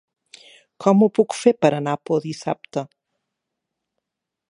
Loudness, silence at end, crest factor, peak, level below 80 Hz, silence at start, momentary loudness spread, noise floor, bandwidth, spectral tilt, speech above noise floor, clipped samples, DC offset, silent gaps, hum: -20 LUFS; 1.65 s; 20 dB; -2 dBFS; -70 dBFS; 0.8 s; 13 LU; -84 dBFS; 11 kHz; -6.5 dB/octave; 65 dB; under 0.1%; under 0.1%; none; none